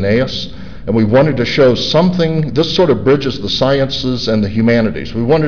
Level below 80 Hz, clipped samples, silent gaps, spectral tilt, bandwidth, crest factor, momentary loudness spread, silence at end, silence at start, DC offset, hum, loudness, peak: -36 dBFS; under 0.1%; none; -6.5 dB/octave; 5.4 kHz; 10 dB; 7 LU; 0 s; 0 s; 3%; none; -13 LUFS; -4 dBFS